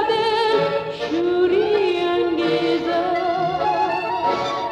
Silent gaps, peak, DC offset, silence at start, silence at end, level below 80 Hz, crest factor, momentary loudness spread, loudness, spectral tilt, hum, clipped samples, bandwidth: none; -6 dBFS; under 0.1%; 0 s; 0 s; -54 dBFS; 12 dB; 4 LU; -20 LUFS; -5.5 dB/octave; none; under 0.1%; 9.4 kHz